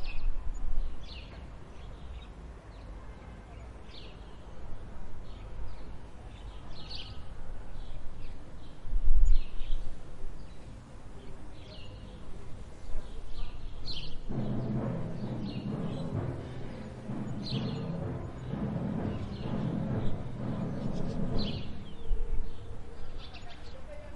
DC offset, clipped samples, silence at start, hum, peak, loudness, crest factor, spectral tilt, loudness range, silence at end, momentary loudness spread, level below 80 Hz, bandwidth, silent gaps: under 0.1%; under 0.1%; 0 s; none; -8 dBFS; -39 LUFS; 20 dB; -7.5 dB/octave; 12 LU; 0 s; 15 LU; -36 dBFS; 5.2 kHz; none